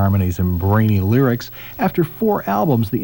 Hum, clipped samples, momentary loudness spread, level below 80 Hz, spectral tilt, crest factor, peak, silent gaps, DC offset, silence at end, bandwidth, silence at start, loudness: none; under 0.1%; 6 LU; -40 dBFS; -8.5 dB/octave; 12 dB; -4 dBFS; none; 0.2%; 0 s; 17 kHz; 0 s; -18 LUFS